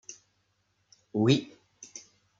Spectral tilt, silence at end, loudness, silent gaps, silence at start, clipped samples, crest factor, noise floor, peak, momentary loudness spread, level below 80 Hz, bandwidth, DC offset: -6 dB/octave; 0.4 s; -27 LUFS; none; 0.1 s; under 0.1%; 22 dB; -74 dBFS; -10 dBFS; 24 LU; -74 dBFS; 7.6 kHz; under 0.1%